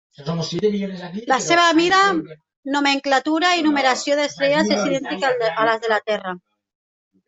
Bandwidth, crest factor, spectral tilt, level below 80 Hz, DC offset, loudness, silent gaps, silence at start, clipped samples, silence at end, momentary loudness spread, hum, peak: 8.2 kHz; 18 dB; -3.5 dB/octave; -64 dBFS; under 0.1%; -19 LUFS; 2.56-2.63 s; 0.2 s; under 0.1%; 0.9 s; 13 LU; none; -2 dBFS